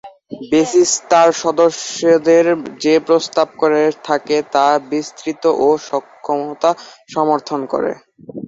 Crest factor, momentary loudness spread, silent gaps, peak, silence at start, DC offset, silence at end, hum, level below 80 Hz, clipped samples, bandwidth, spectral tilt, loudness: 14 dB; 11 LU; none; -2 dBFS; 0.05 s; under 0.1%; 0 s; none; -62 dBFS; under 0.1%; 8 kHz; -3.5 dB/octave; -15 LUFS